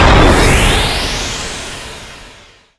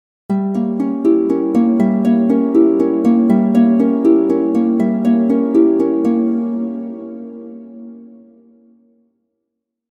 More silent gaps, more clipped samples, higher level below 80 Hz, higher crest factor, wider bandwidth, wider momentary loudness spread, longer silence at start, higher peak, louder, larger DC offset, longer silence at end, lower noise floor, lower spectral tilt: neither; neither; first, -18 dBFS vs -62 dBFS; about the same, 12 dB vs 14 dB; first, 11 kHz vs 4.1 kHz; first, 20 LU vs 17 LU; second, 0 s vs 0.3 s; about the same, 0 dBFS vs -2 dBFS; about the same, -12 LUFS vs -14 LUFS; neither; second, 0.5 s vs 1.85 s; second, -41 dBFS vs -77 dBFS; second, -4 dB/octave vs -9.5 dB/octave